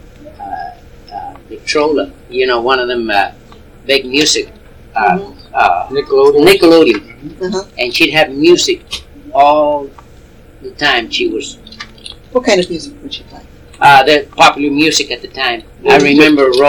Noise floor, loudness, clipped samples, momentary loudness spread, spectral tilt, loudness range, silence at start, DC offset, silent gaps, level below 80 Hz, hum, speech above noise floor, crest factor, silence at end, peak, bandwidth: -38 dBFS; -11 LUFS; 0.5%; 21 LU; -3.5 dB/octave; 6 LU; 0.2 s; under 0.1%; none; -40 dBFS; none; 27 dB; 12 dB; 0 s; 0 dBFS; 19.5 kHz